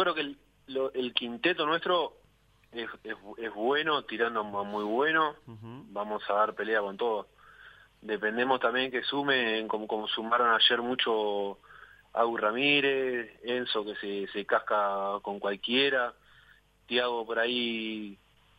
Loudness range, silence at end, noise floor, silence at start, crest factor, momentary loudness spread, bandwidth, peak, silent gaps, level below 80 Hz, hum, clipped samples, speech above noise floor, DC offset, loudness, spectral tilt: 5 LU; 0.45 s; -64 dBFS; 0 s; 22 dB; 13 LU; 8.8 kHz; -8 dBFS; none; -70 dBFS; none; under 0.1%; 34 dB; under 0.1%; -29 LUFS; -5.5 dB/octave